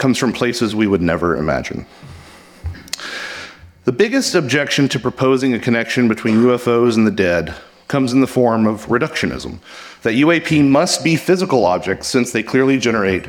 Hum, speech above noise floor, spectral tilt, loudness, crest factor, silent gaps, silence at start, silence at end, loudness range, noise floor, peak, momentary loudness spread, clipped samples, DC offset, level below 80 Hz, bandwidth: none; 25 dB; -5 dB/octave; -16 LUFS; 14 dB; none; 0 s; 0 s; 6 LU; -40 dBFS; -2 dBFS; 14 LU; under 0.1%; under 0.1%; -44 dBFS; 17.5 kHz